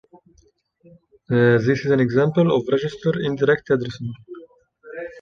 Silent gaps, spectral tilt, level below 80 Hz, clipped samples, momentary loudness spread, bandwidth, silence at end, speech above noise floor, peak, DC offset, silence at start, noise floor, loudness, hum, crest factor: none; -8 dB/octave; -56 dBFS; under 0.1%; 19 LU; 7 kHz; 0 s; 27 dB; -4 dBFS; under 0.1%; 1.3 s; -47 dBFS; -19 LUFS; none; 18 dB